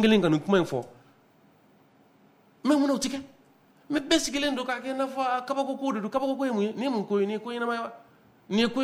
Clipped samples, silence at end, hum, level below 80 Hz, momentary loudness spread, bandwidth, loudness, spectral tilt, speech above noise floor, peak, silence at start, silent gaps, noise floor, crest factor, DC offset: under 0.1%; 0 s; none; -60 dBFS; 8 LU; 16 kHz; -27 LUFS; -4.5 dB/octave; 34 dB; -8 dBFS; 0 s; none; -60 dBFS; 20 dB; under 0.1%